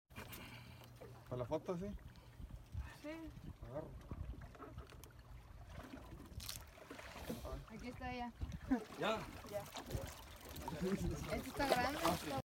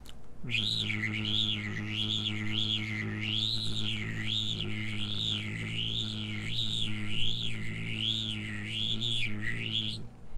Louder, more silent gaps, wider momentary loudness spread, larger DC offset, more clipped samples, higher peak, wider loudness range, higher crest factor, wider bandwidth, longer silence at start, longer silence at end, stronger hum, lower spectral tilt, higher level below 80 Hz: second, -45 LUFS vs -32 LUFS; neither; first, 17 LU vs 6 LU; neither; neither; second, -20 dBFS vs -16 dBFS; first, 11 LU vs 2 LU; first, 26 dB vs 16 dB; first, 17 kHz vs 13 kHz; about the same, 0.1 s vs 0 s; about the same, 0.05 s vs 0 s; neither; about the same, -5 dB/octave vs -4 dB/octave; second, -56 dBFS vs -48 dBFS